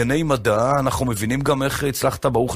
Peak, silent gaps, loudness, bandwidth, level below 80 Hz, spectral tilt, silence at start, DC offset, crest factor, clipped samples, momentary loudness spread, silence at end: -4 dBFS; none; -20 LUFS; 15.5 kHz; -38 dBFS; -5.5 dB/octave; 0 s; under 0.1%; 16 dB; under 0.1%; 3 LU; 0 s